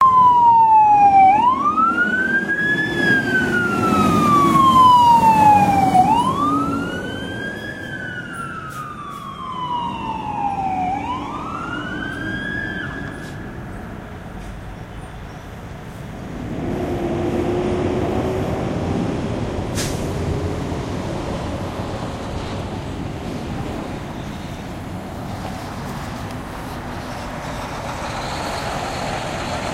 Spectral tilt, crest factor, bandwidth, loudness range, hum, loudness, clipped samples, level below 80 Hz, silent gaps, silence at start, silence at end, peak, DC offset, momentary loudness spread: -5.5 dB/octave; 18 dB; 16 kHz; 16 LU; none; -19 LUFS; under 0.1%; -38 dBFS; none; 0 s; 0 s; -2 dBFS; under 0.1%; 20 LU